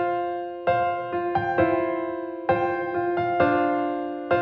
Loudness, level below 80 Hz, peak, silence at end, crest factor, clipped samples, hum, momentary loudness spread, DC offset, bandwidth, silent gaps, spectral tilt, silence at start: -25 LUFS; -58 dBFS; -8 dBFS; 0 s; 16 dB; under 0.1%; none; 7 LU; under 0.1%; 5.4 kHz; none; -8.5 dB/octave; 0 s